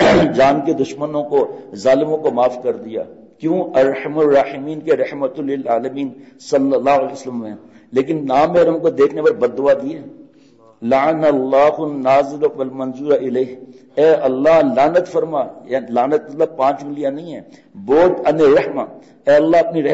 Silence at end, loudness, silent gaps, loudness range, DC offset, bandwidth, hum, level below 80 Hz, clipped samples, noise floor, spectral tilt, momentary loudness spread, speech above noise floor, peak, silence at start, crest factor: 0 s; -16 LUFS; none; 3 LU; under 0.1%; 8 kHz; none; -52 dBFS; under 0.1%; -48 dBFS; -6.5 dB/octave; 13 LU; 32 dB; -4 dBFS; 0 s; 12 dB